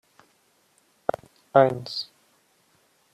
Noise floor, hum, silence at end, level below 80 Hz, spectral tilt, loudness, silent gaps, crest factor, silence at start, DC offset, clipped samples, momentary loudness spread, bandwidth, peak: -65 dBFS; none; 1.1 s; -68 dBFS; -6 dB/octave; -24 LUFS; none; 24 dB; 1.55 s; under 0.1%; under 0.1%; 18 LU; 13.5 kHz; -4 dBFS